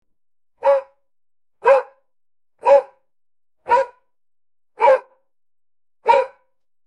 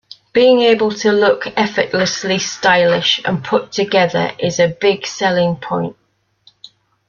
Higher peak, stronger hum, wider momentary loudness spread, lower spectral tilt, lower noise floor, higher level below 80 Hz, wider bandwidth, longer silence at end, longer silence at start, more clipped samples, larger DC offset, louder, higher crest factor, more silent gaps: about the same, -2 dBFS vs 0 dBFS; neither; first, 10 LU vs 7 LU; about the same, -3 dB/octave vs -4 dB/octave; first, -61 dBFS vs -53 dBFS; second, -68 dBFS vs -56 dBFS; first, 8.8 kHz vs 7.4 kHz; second, 0.6 s vs 1.15 s; first, 0.65 s vs 0.35 s; neither; neither; second, -18 LUFS vs -15 LUFS; first, 20 dB vs 14 dB; neither